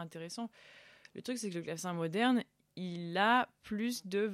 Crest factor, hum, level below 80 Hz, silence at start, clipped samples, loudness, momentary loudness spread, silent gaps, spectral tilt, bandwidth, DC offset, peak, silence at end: 20 dB; none; -78 dBFS; 0 s; under 0.1%; -35 LUFS; 16 LU; none; -4.5 dB/octave; 15 kHz; under 0.1%; -16 dBFS; 0 s